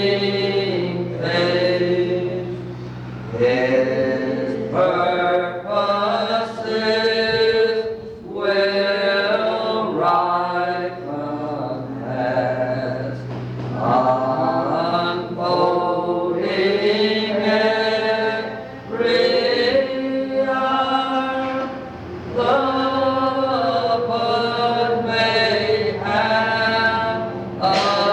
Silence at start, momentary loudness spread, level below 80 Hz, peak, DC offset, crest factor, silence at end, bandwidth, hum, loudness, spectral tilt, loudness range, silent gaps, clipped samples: 0 s; 10 LU; -54 dBFS; -6 dBFS; under 0.1%; 14 dB; 0 s; 9.8 kHz; none; -20 LUFS; -6 dB/octave; 3 LU; none; under 0.1%